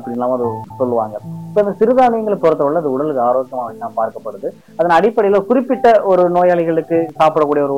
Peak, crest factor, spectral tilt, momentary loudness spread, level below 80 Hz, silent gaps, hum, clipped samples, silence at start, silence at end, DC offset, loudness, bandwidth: -4 dBFS; 12 dB; -7.5 dB/octave; 12 LU; -54 dBFS; none; none; under 0.1%; 0 s; 0 s; 0.3%; -15 LUFS; 12.5 kHz